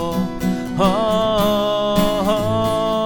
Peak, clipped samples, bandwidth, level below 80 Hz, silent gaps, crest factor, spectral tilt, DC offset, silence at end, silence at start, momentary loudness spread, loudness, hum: -4 dBFS; under 0.1%; 19 kHz; -36 dBFS; none; 14 dB; -6 dB/octave; under 0.1%; 0 s; 0 s; 5 LU; -18 LUFS; none